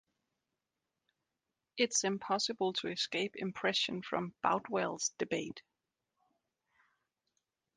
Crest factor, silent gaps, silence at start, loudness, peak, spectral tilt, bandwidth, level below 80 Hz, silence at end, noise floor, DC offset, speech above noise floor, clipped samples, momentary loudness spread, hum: 24 dB; none; 1.75 s; -35 LUFS; -16 dBFS; -2.5 dB/octave; 10 kHz; -80 dBFS; 2.15 s; -89 dBFS; under 0.1%; 53 dB; under 0.1%; 7 LU; none